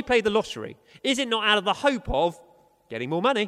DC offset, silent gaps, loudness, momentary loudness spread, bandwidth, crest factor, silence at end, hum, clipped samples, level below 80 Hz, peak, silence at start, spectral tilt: under 0.1%; none; -24 LUFS; 14 LU; 13.5 kHz; 18 dB; 0 s; none; under 0.1%; -46 dBFS; -6 dBFS; 0 s; -4 dB/octave